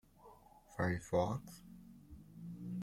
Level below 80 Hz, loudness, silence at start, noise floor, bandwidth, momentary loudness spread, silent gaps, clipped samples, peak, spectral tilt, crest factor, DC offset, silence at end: -64 dBFS; -40 LUFS; 0.2 s; -62 dBFS; 16.5 kHz; 24 LU; none; under 0.1%; -20 dBFS; -7 dB/octave; 22 dB; under 0.1%; 0 s